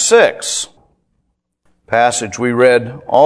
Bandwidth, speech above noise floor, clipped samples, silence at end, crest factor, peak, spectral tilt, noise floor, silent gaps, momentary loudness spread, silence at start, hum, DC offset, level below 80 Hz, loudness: 11 kHz; 55 dB; 0.2%; 0 s; 14 dB; 0 dBFS; -3 dB/octave; -67 dBFS; none; 9 LU; 0 s; none; under 0.1%; -56 dBFS; -14 LUFS